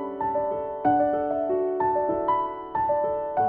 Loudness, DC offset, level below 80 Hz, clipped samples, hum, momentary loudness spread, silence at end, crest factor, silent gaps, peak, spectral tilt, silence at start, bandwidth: -25 LUFS; under 0.1%; -56 dBFS; under 0.1%; none; 5 LU; 0 s; 14 dB; none; -10 dBFS; -10.5 dB/octave; 0 s; 3.8 kHz